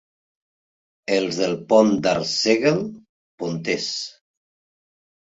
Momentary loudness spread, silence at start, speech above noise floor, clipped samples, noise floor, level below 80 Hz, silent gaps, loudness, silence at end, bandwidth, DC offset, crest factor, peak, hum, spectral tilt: 15 LU; 1.1 s; over 70 dB; under 0.1%; under -90 dBFS; -62 dBFS; 3.09-3.38 s; -21 LUFS; 1.15 s; 8 kHz; under 0.1%; 20 dB; -2 dBFS; none; -4.5 dB/octave